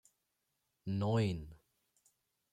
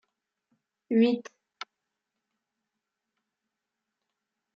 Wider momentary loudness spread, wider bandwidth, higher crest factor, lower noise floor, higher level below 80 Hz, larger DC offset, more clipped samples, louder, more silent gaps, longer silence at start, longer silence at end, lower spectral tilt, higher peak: second, 17 LU vs 21 LU; first, 9.8 kHz vs 6.8 kHz; about the same, 18 dB vs 22 dB; about the same, -84 dBFS vs -86 dBFS; first, -64 dBFS vs -86 dBFS; neither; neither; second, -37 LUFS vs -26 LUFS; neither; about the same, 0.85 s vs 0.9 s; second, 0.95 s vs 3.35 s; first, -7.5 dB/octave vs -5 dB/octave; second, -24 dBFS vs -12 dBFS